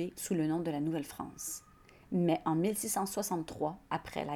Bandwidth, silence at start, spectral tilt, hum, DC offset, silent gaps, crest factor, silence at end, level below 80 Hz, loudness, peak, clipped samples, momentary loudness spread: 19.5 kHz; 0 s; -5 dB/octave; none; under 0.1%; none; 18 dB; 0 s; -64 dBFS; -35 LUFS; -18 dBFS; under 0.1%; 10 LU